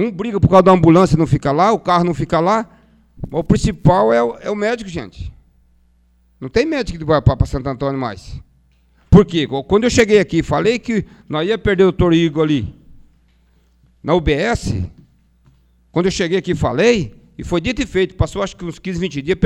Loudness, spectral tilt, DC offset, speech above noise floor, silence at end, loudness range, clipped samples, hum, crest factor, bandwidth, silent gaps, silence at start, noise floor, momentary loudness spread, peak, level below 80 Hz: -16 LUFS; -6.5 dB/octave; under 0.1%; 40 dB; 0 s; 6 LU; under 0.1%; none; 16 dB; 11 kHz; none; 0 s; -55 dBFS; 16 LU; 0 dBFS; -34 dBFS